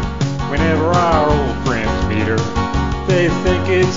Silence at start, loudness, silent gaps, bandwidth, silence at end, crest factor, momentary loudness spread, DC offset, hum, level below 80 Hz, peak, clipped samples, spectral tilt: 0 s; -16 LUFS; none; 7.6 kHz; 0 s; 16 dB; 5 LU; 2%; none; -26 dBFS; 0 dBFS; under 0.1%; -6.5 dB/octave